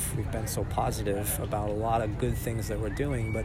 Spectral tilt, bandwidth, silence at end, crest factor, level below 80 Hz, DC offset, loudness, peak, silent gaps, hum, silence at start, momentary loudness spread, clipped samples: -5.5 dB/octave; 16 kHz; 0 s; 16 dB; -38 dBFS; under 0.1%; -30 LUFS; -14 dBFS; none; none; 0 s; 4 LU; under 0.1%